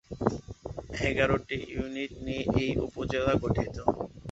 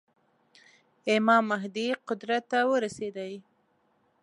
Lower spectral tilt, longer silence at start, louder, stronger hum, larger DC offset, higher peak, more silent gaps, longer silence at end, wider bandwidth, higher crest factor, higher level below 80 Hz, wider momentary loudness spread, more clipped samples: first, -6.5 dB/octave vs -4.5 dB/octave; second, 0.1 s vs 1.05 s; about the same, -30 LUFS vs -28 LUFS; neither; neither; first, -6 dBFS vs -10 dBFS; neither; second, 0 s vs 0.8 s; second, 8.2 kHz vs 11 kHz; about the same, 24 dB vs 20 dB; first, -44 dBFS vs -78 dBFS; second, 10 LU vs 15 LU; neither